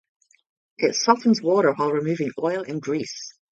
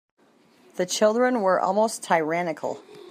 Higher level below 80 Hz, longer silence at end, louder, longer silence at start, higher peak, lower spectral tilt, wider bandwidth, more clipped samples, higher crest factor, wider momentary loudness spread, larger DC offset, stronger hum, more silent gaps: first, -72 dBFS vs -80 dBFS; about the same, 0.2 s vs 0.1 s; about the same, -22 LUFS vs -23 LUFS; about the same, 0.8 s vs 0.75 s; first, -2 dBFS vs -6 dBFS; about the same, -4.5 dB/octave vs -4 dB/octave; second, 7.8 kHz vs 15.5 kHz; neither; about the same, 20 dB vs 18 dB; second, 9 LU vs 12 LU; neither; neither; neither